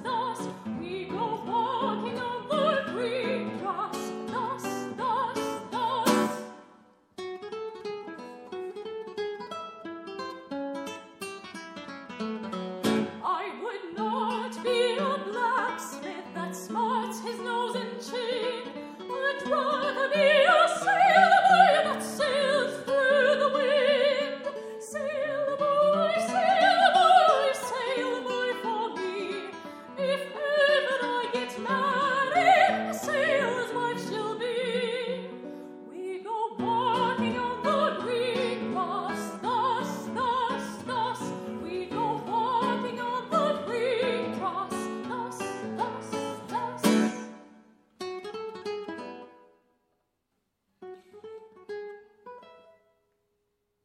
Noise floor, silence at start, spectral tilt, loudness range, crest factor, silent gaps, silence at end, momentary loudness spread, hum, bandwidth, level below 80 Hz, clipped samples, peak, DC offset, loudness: -79 dBFS; 0 s; -4 dB/octave; 15 LU; 22 dB; none; 1.3 s; 18 LU; none; 16 kHz; -74 dBFS; under 0.1%; -6 dBFS; under 0.1%; -27 LUFS